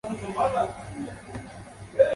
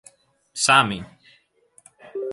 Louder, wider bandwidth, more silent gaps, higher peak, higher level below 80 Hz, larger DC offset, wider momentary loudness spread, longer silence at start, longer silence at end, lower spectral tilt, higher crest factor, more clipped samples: second, -29 LUFS vs -19 LUFS; about the same, 11.5 kHz vs 11.5 kHz; neither; second, -6 dBFS vs -2 dBFS; first, -52 dBFS vs -60 dBFS; neither; second, 16 LU vs 20 LU; second, 0.05 s vs 0.55 s; about the same, 0 s vs 0 s; first, -6 dB/octave vs -2 dB/octave; about the same, 20 dB vs 24 dB; neither